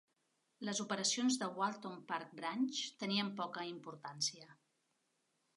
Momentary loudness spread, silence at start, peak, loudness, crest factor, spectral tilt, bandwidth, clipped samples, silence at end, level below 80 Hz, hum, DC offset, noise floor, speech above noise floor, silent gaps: 12 LU; 0.6 s; -22 dBFS; -39 LUFS; 18 dB; -2.5 dB/octave; 11.5 kHz; under 0.1%; 1.05 s; under -90 dBFS; none; under 0.1%; -82 dBFS; 42 dB; none